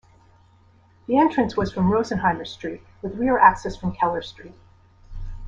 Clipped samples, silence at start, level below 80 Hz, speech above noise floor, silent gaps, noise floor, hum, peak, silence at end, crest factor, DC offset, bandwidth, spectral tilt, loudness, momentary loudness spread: under 0.1%; 1.1 s; -42 dBFS; 34 dB; none; -55 dBFS; none; -2 dBFS; 0 s; 22 dB; under 0.1%; 7.8 kHz; -7 dB/octave; -21 LUFS; 19 LU